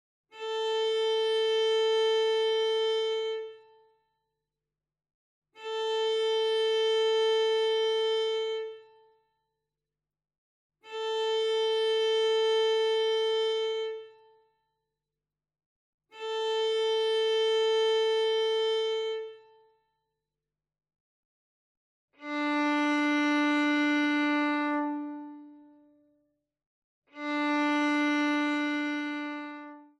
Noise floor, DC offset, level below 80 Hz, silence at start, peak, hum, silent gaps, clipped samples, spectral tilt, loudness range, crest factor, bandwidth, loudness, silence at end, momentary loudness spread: under -90 dBFS; under 0.1%; under -90 dBFS; 0.35 s; -18 dBFS; 50 Hz at -95 dBFS; 5.14-5.42 s, 10.38-10.70 s, 15.66-15.98 s, 21.00-22.08 s, 26.66-27.02 s; under 0.1%; -1.5 dB/octave; 8 LU; 12 dB; 10.5 kHz; -28 LUFS; 0.15 s; 12 LU